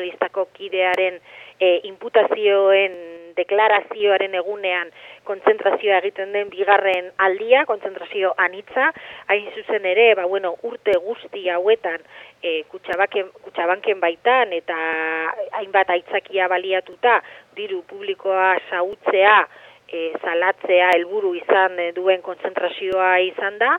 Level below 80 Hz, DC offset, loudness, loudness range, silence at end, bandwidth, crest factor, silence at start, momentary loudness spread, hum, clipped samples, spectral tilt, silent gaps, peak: -70 dBFS; under 0.1%; -19 LUFS; 3 LU; 0 s; 6.2 kHz; 18 dB; 0 s; 11 LU; none; under 0.1%; -4.5 dB/octave; none; -2 dBFS